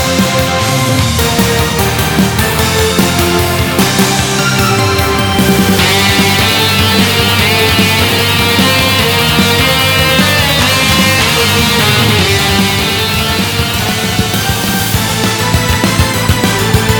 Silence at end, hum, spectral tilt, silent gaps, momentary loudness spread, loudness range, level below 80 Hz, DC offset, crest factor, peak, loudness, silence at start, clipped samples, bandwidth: 0 s; none; -3.5 dB/octave; none; 4 LU; 3 LU; -26 dBFS; under 0.1%; 10 dB; 0 dBFS; -9 LUFS; 0 s; under 0.1%; over 20 kHz